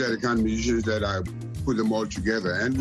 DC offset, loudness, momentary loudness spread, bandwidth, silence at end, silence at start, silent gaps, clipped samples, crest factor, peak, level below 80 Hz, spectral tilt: under 0.1%; -26 LUFS; 6 LU; 12.5 kHz; 0 s; 0 s; none; under 0.1%; 14 dB; -12 dBFS; -40 dBFS; -5.5 dB/octave